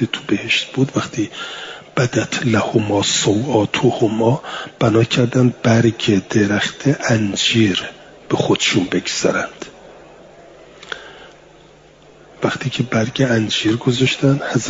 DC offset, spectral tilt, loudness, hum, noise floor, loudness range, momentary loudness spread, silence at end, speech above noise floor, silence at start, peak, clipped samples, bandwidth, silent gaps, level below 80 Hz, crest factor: under 0.1%; -5 dB/octave; -17 LUFS; none; -46 dBFS; 9 LU; 10 LU; 0 s; 29 dB; 0 s; -2 dBFS; under 0.1%; 7.8 kHz; none; -54 dBFS; 16 dB